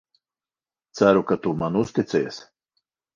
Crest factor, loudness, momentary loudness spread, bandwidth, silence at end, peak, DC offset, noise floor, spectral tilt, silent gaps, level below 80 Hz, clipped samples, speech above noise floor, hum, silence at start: 22 dB; -22 LUFS; 16 LU; 7.4 kHz; 0.7 s; -4 dBFS; under 0.1%; under -90 dBFS; -6.5 dB/octave; none; -58 dBFS; under 0.1%; over 69 dB; none; 0.95 s